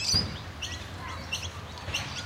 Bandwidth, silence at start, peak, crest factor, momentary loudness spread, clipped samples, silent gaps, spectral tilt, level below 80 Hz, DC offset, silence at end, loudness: 16 kHz; 0 s; -12 dBFS; 20 dB; 12 LU; under 0.1%; none; -2.5 dB/octave; -46 dBFS; under 0.1%; 0 s; -33 LUFS